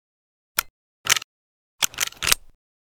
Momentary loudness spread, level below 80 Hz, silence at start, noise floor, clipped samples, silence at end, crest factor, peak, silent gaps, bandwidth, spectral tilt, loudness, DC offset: 6 LU; -48 dBFS; 0.55 s; under -90 dBFS; under 0.1%; 0.45 s; 28 dB; 0 dBFS; 0.70-1.04 s, 1.24-1.79 s; over 20 kHz; 1.5 dB/octave; -23 LUFS; under 0.1%